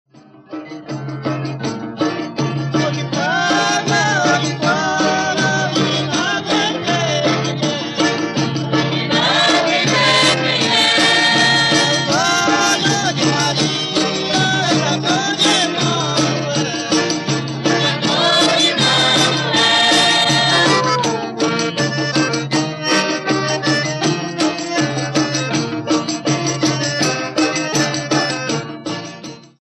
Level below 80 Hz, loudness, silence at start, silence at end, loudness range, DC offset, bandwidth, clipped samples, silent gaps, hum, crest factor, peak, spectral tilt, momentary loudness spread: -56 dBFS; -15 LUFS; 0.4 s; 0.2 s; 6 LU; under 0.1%; 12.5 kHz; under 0.1%; none; none; 16 dB; -2 dBFS; -3.5 dB/octave; 9 LU